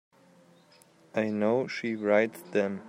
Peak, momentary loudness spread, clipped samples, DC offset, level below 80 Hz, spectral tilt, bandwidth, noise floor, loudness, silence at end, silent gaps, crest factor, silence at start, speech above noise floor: -10 dBFS; 7 LU; under 0.1%; under 0.1%; -76 dBFS; -6.5 dB/octave; 16 kHz; -60 dBFS; -29 LUFS; 0 s; none; 20 dB; 1.15 s; 32 dB